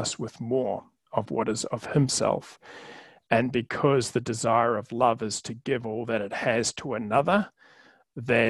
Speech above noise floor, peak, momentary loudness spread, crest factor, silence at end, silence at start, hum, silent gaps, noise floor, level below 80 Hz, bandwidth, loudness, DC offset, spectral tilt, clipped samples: 31 dB; -4 dBFS; 14 LU; 22 dB; 0 s; 0 s; none; none; -57 dBFS; -62 dBFS; 12.5 kHz; -27 LUFS; under 0.1%; -4.5 dB/octave; under 0.1%